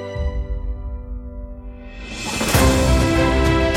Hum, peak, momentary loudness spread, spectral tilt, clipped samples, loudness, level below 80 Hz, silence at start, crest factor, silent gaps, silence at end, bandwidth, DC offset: none; -4 dBFS; 20 LU; -5 dB/octave; under 0.1%; -19 LUFS; -24 dBFS; 0 s; 16 dB; none; 0 s; 16.5 kHz; under 0.1%